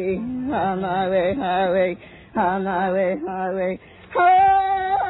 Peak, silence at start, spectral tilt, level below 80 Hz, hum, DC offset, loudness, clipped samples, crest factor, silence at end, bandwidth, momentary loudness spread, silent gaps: -6 dBFS; 0 s; -10 dB/octave; -50 dBFS; none; under 0.1%; -21 LUFS; under 0.1%; 14 dB; 0 s; 4.1 kHz; 11 LU; none